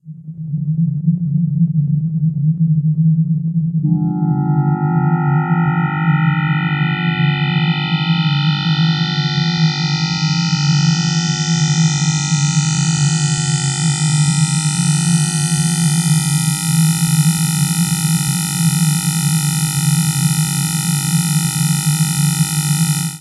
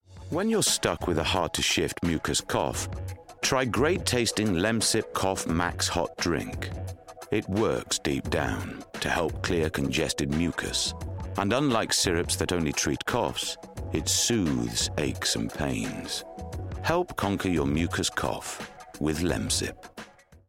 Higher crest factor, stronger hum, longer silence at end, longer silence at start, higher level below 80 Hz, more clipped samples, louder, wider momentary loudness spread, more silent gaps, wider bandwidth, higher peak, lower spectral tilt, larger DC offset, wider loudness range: second, 12 dB vs 18 dB; neither; about the same, 0 s vs 0.1 s; about the same, 0.05 s vs 0.1 s; second, -52 dBFS vs -46 dBFS; neither; first, -15 LUFS vs -27 LUFS; second, 3 LU vs 11 LU; neither; second, 14.5 kHz vs 16.5 kHz; first, -4 dBFS vs -10 dBFS; about the same, -4 dB/octave vs -3.5 dB/octave; neither; about the same, 1 LU vs 3 LU